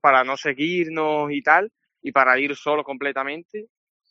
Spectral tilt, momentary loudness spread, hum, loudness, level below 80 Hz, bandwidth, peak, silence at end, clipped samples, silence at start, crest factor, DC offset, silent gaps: -2 dB/octave; 16 LU; none; -21 LUFS; -74 dBFS; 7.6 kHz; 0 dBFS; 0.45 s; under 0.1%; 0.05 s; 22 dB; under 0.1%; 3.45-3.49 s